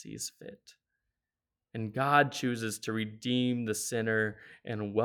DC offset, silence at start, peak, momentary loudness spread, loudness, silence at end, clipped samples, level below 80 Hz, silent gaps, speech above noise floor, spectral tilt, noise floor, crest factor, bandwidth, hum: under 0.1%; 0 s; -10 dBFS; 16 LU; -31 LUFS; 0 s; under 0.1%; -74 dBFS; none; over 58 dB; -4.5 dB/octave; under -90 dBFS; 22 dB; 19 kHz; none